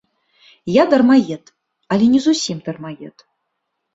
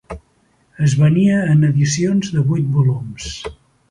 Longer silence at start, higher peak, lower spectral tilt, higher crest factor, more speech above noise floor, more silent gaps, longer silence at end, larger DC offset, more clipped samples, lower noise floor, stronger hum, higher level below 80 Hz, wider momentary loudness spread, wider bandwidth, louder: first, 0.65 s vs 0.1 s; about the same, -2 dBFS vs -4 dBFS; second, -5 dB/octave vs -6.5 dB/octave; about the same, 16 dB vs 14 dB; first, 59 dB vs 43 dB; neither; first, 0.85 s vs 0.4 s; neither; neither; first, -74 dBFS vs -58 dBFS; neither; second, -60 dBFS vs -44 dBFS; first, 20 LU vs 16 LU; second, 8 kHz vs 10.5 kHz; about the same, -15 LUFS vs -16 LUFS